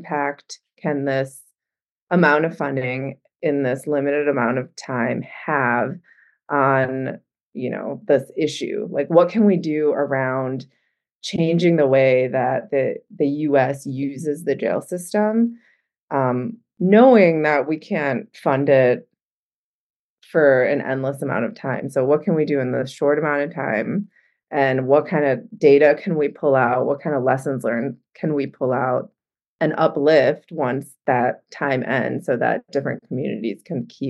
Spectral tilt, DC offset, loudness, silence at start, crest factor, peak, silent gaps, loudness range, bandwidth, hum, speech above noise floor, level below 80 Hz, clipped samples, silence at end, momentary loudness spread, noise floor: -7 dB/octave; under 0.1%; -20 LUFS; 0 s; 18 dB; -2 dBFS; 1.90-2.07 s, 7.47-7.52 s, 11.15-11.21 s, 15.99-16.08 s, 19.25-20.17 s, 29.48-29.59 s; 5 LU; 12.5 kHz; none; over 71 dB; -74 dBFS; under 0.1%; 0 s; 11 LU; under -90 dBFS